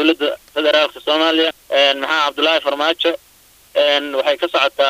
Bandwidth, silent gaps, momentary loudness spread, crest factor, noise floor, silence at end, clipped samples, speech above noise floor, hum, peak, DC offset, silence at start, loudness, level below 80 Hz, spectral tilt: 15.5 kHz; none; 5 LU; 16 dB; -36 dBFS; 0 s; under 0.1%; 20 dB; none; 0 dBFS; under 0.1%; 0 s; -16 LUFS; -62 dBFS; -1.5 dB/octave